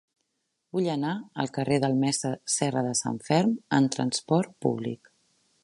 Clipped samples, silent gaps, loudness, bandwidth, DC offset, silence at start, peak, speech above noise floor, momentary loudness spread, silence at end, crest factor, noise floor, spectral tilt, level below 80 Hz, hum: under 0.1%; none; -27 LUFS; 11.5 kHz; under 0.1%; 0.75 s; -8 dBFS; 52 dB; 7 LU; 0.7 s; 20 dB; -79 dBFS; -5 dB/octave; -68 dBFS; none